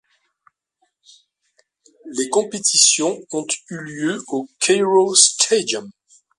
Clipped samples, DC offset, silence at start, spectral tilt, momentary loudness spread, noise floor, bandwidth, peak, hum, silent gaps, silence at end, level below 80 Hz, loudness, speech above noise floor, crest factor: under 0.1%; under 0.1%; 2.05 s; -1.5 dB/octave; 14 LU; -69 dBFS; 11.5 kHz; 0 dBFS; none; none; 0.5 s; -70 dBFS; -17 LUFS; 51 dB; 20 dB